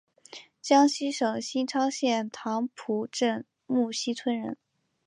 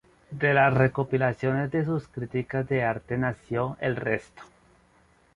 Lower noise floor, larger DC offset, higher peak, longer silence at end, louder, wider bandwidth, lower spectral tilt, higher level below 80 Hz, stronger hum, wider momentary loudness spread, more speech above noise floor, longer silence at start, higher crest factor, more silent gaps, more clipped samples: second, -50 dBFS vs -61 dBFS; neither; about the same, -8 dBFS vs -8 dBFS; second, 0.5 s vs 0.9 s; about the same, -28 LUFS vs -26 LUFS; about the same, 11 kHz vs 10.5 kHz; second, -3.5 dB/octave vs -8.5 dB/octave; second, -80 dBFS vs -56 dBFS; neither; first, 17 LU vs 10 LU; second, 23 dB vs 35 dB; about the same, 0.35 s vs 0.3 s; about the same, 20 dB vs 18 dB; neither; neither